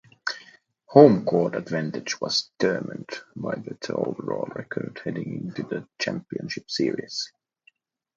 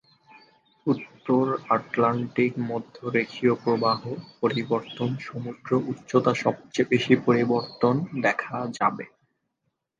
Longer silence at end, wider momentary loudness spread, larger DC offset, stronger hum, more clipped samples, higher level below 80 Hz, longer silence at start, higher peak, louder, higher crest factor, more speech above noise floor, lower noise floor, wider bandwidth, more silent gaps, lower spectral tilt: about the same, 0.9 s vs 0.95 s; first, 15 LU vs 10 LU; neither; neither; neither; about the same, -68 dBFS vs -68 dBFS; second, 0.25 s vs 0.85 s; first, 0 dBFS vs -4 dBFS; about the same, -25 LUFS vs -25 LUFS; about the same, 24 dB vs 22 dB; second, 39 dB vs 54 dB; second, -63 dBFS vs -78 dBFS; about the same, 7.6 kHz vs 7.6 kHz; neither; about the same, -5.5 dB/octave vs -6.5 dB/octave